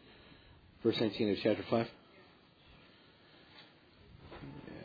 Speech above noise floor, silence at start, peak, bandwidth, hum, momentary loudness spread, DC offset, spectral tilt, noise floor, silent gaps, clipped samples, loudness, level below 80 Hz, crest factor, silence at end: 29 dB; 0.05 s; -16 dBFS; 5 kHz; none; 25 LU; under 0.1%; -4.5 dB/octave; -62 dBFS; none; under 0.1%; -34 LUFS; -68 dBFS; 22 dB; 0 s